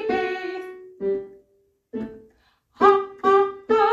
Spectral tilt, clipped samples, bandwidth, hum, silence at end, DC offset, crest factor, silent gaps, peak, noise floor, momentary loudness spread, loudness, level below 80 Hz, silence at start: -5.5 dB/octave; under 0.1%; 7.4 kHz; none; 0 s; under 0.1%; 20 dB; none; -4 dBFS; -65 dBFS; 19 LU; -22 LUFS; -62 dBFS; 0 s